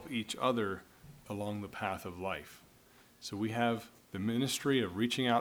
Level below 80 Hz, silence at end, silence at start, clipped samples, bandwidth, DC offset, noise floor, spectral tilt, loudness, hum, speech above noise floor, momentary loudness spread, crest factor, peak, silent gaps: -68 dBFS; 0 s; 0 s; under 0.1%; over 20 kHz; under 0.1%; -62 dBFS; -4.5 dB/octave; -35 LUFS; none; 28 dB; 13 LU; 20 dB; -16 dBFS; none